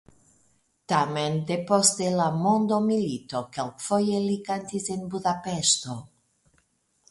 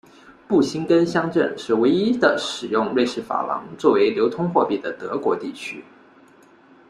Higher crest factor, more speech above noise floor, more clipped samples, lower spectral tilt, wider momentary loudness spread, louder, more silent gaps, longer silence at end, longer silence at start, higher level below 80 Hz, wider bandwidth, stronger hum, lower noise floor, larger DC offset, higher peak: about the same, 22 dB vs 20 dB; first, 44 dB vs 31 dB; neither; second, -4 dB/octave vs -5.5 dB/octave; about the same, 11 LU vs 9 LU; second, -25 LUFS vs -21 LUFS; neither; about the same, 1.05 s vs 1.1 s; first, 0.9 s vs 0.3 s; about the same, -64 dBFS vs -62 dBFS; about the same, 11.5 kHz vs 11 kHz; neither; first, -69 dBFS vs -51 dBFS; neither; about the same, -4 dBFS vs -2 dBFS